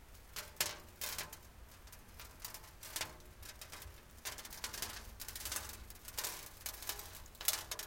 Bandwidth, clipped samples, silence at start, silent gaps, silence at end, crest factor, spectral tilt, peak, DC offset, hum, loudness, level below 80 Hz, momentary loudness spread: 17 kHz; under 0.1%; 0 s; none; 0 s; 34 dB; -0.5 dB/octave; -14 dBFS; under 0.1%; none; -43 LUFS; -60 dBFS; 16 LU